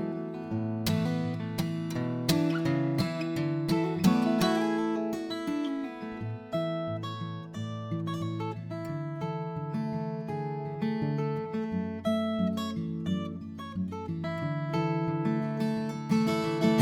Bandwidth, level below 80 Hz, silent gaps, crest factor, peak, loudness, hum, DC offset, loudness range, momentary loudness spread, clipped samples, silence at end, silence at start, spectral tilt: 19 kHz; -62 dBFS; none; 20 dB; -10 dBFS; -31 LUFS; none; under 0.1%; 7 LU; 9 LU; under 0.1%; 0 s; 0 s; -6.5 dB/octave